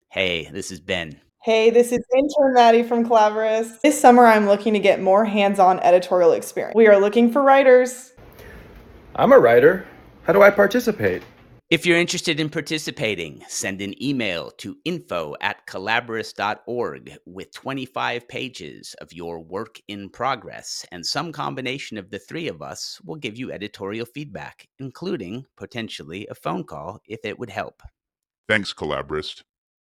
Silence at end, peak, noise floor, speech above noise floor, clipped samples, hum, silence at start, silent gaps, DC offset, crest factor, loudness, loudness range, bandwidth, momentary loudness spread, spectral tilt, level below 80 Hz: 0.55 s; 0 dBFS; -44 dBFS; 25 dB; under 0.1%; none; 0.15 s; 28.38-28.44 s; under 0.1%; 20 dB; -19 LUFS; 15 LU; 16 kHz; 20 LU; -4.5 dB/octave; -58 dBFS